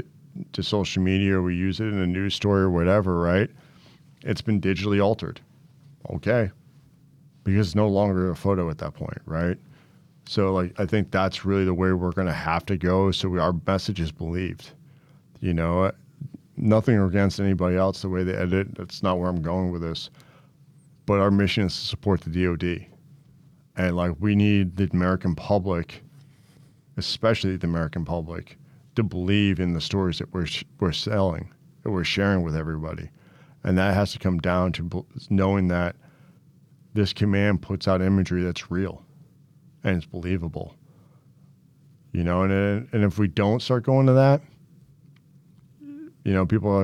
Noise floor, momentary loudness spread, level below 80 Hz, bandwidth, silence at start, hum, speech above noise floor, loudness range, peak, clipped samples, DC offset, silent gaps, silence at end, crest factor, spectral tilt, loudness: -55 dBFS; 12 LU; -50 dBFS; 12 kHz; 0 s; none; 32 dB; 4 LU; -8 dBFS; under 0.1%; under 0.1%; none; 0 s; 16 dB; -7 dB/octave; -24 LUFS